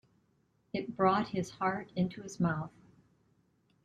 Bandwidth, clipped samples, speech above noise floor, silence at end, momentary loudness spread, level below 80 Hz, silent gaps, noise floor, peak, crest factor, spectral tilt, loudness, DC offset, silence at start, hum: 9.6 kHz; under 0.1%; 40 dB; 1.15 s; 11 LU; -66 dBFS; none; -73 dBFS; -14 dBFS; 22 dB; -6.5 dB/octave; -34 LUFS; under 0.1%; 0.75 s; none